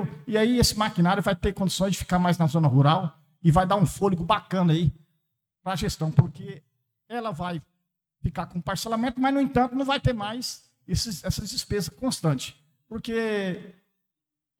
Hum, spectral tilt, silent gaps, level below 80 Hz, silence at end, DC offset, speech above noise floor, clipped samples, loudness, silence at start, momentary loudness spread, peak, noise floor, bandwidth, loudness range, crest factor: none; -5.5 dB/octave; none; -44 dBFS; 0.9 s; under 0.1%; 61 dB; under 0.1%; -25 LUFS; 0 s; 13 LU; -6 dBFS; -85 dBFS; 17 kHz; 7 LU; 20 dB